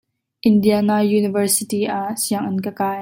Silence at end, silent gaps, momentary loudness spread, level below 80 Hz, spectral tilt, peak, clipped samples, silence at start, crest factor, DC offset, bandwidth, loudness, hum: 0 s; none; 7 LU; -62 dBFS; -5 dB/octave; -4 dBFS; under 0.1%; 0.45 s; 14 dB; under 0.1%; 16.5 kHz; -18 LUFS; none